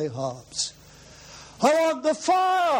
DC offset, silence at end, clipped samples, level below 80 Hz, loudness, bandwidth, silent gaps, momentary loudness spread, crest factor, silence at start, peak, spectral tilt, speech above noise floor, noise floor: under 0.1%; 0 s; under 0.1%; -60 dBFS; -24 LUFS; 16.5 kHz; none; 23 LU; 18 dB; 0 s; -6 dBFS; -3.5 dB/octave; 25 dB; -48 dBFS